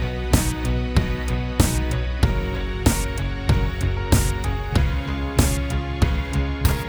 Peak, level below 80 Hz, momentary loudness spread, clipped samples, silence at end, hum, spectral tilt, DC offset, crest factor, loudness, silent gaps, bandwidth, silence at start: -2 dBFS; -24 dBFS; 5 LU; under 0.1%; 0 s; none; -5 dB/octave; under 0.1%; 18 dB; -23 LUFS; none; over 20 kHz; 0 s